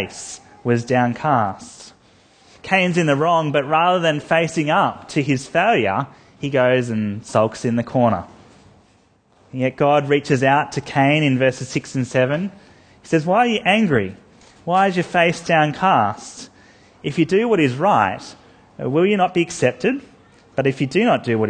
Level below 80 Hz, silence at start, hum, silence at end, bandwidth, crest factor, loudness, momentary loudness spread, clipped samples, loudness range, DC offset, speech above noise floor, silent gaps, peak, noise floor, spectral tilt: -56 dBFS; 0 s; none; 0 s; 9.8 kHz; 18 dB; -18 LUFS; 13 LU; under 0.1%; 3 LU; under 0.1%; 38 dB; none; 0 dBFS; -56 dBFS; -6 dB/octave